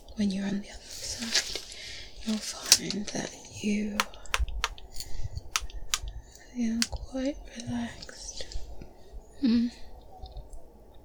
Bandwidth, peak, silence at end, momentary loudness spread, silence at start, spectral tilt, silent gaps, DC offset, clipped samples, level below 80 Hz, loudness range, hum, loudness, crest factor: over 20 kHz; -4 dBFS; 0 s; 21 LU; 0 s; -2.5 dB/octave; none; under 0.1%; under 0.1%; -44 dBFS; 6 LU; none; -31 LUFS; 28 dB